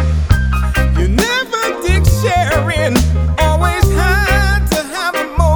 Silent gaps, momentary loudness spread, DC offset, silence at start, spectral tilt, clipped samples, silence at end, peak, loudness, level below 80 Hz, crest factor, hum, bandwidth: none; 4 LU; under 0.1%; 0 s; -5 dB/octave; under 0.1%; 0 s; 0 dBFS; -14 LUFS; -16 dBFS; 12 dB; none; over 20 kHz